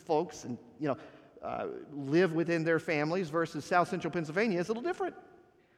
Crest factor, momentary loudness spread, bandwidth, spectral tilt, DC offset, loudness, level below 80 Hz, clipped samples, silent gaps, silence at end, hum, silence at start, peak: 20 dB; 12 LU; 12.5 kHz; -6.5 dB/octave; under 0.1%; -32 LUFS; -72 dBFS; under 0.1%; none; 0.55 s; none; 0.1 s; -12 dBFS